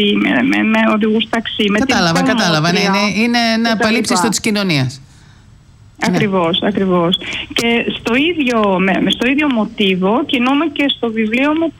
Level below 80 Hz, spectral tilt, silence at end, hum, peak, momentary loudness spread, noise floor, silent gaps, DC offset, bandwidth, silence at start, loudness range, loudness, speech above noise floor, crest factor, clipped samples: -46 dBFS; -4.5 dB/octave; 0.1 s; none; -4 dBFS; 3 LU; -43 dBFS; none; under 0.1%; 16 kHz; 0 s; 3 LU; -14 LUFS; 29 dB; 10 dB; under 0.1%